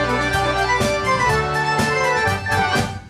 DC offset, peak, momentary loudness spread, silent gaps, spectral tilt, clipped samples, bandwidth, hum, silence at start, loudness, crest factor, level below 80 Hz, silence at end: under 0.1%; -6 dBFS; 2 LU; none; -4 dB/octave; under 0.1%; 15.5 kHz; none; 0 s; -18 LUFS; 14 dB; -36 dBFS; 0 s